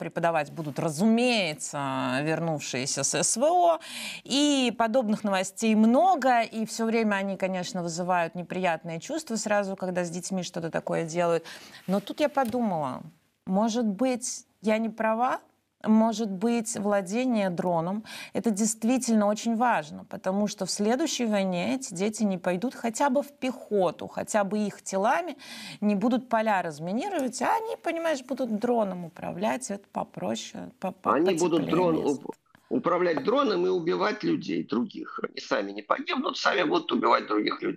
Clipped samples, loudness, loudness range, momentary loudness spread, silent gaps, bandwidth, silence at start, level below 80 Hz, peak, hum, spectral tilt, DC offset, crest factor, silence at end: under 0.1%; -27 LUFS; 5 LU; 10 LU; none; 15 kHz; 0 s; -72 dBFS; -8 dBFS; none; -4.5 dB/octave; under 0.1%; 18 dB; 0 s